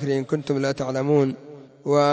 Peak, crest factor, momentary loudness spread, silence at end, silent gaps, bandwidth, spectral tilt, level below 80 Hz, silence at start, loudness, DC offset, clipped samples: -6 dBFS; 16 dB; 9 LU; 0 s; none; 8 kHz; -7 dB/octave; -62 dBFS; 0 s; -23 LUFS; under 0.1%; under 0.1%